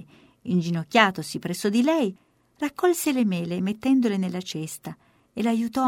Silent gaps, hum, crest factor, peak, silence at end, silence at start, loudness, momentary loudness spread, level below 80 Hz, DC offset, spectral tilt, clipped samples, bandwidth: none; none; 22 dB; -2 dBFS; 0 s; 0 s; -24 LUFS; 12 LU; -66 dBFS; under 0.1%; -5 dB/octave; under 0.1%; 16.5 kHz